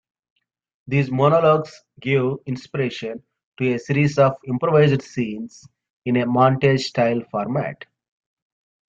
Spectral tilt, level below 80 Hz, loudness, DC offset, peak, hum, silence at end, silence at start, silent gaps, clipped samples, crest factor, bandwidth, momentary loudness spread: -7.5 dB/octave; -58 dBFS; -20 LUFS; under 0.1%; -2 dBFS; none; 1.15 s; 0.85 s; 3.44-3.52 s, 5.90-6.02 s; under 0.1%; 18 dB; 7.8 kHz; 15 LU